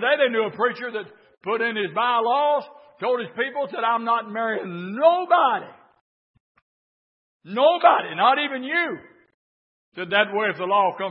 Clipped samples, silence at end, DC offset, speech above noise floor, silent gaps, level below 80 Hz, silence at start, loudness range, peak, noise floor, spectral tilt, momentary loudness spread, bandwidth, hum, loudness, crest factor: under 0.1%; 0 s; under 0.1%; over 68 dB; 6.01-6.34 s, 6.40-6.55 s, 6.62-7.40 s, 9.34-9.92 s; -78 dBFS; 0 s; 2 LU; -2 dBFS; under -90 dBFS; -8.5 dB/octave; 13 LU; 5.6 kHz; none; -22 LUFS; 22 dB